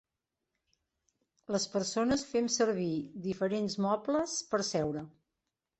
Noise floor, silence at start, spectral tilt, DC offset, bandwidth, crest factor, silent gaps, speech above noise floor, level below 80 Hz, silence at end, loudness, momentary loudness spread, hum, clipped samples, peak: -88 dBFS; 1.5 s; -4 dB/octave; under 0.1%; 8.6 kHz; 18 dB; none; 56 dB; -66 dBFS; 0.7 s; -32 LUFS; 7 LU; none; under 0.1%; -16 dBFS